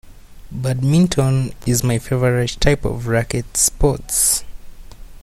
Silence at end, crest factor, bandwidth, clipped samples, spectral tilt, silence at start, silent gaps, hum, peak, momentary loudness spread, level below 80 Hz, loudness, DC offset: 0.05 s; 18 dB; 15.5 kHz; under 0.1%; -4.5 dB/octave; 0.05 s; none; none; 0 dBFS; 6 LU; -30 dBFS; -17 LUFS; under 0.1%